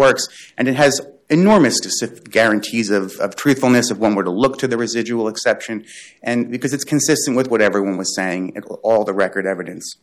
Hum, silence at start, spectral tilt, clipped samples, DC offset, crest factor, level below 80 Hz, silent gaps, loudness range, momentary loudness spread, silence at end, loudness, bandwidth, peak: none; 0 s; -4 dB/octave; under 0.1%; under 0.1%; 14 dB; -56 dBFS; none; 3 LU; 9 LU; 0.1 s; -17 LUFS; 15 kHz; -4 dBFS